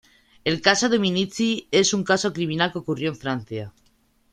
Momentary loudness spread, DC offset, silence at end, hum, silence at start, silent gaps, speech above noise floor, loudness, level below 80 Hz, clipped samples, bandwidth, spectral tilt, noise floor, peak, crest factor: 10 LU; under 0.1%; 0.6 s; none; 0.45 s; none; 40 dB; -22 LUFS; -60 dBFS; under 0.1%; 12 kHz; -3.5 dB/octave; -62 dBFS; 0 dBFS; 22 dB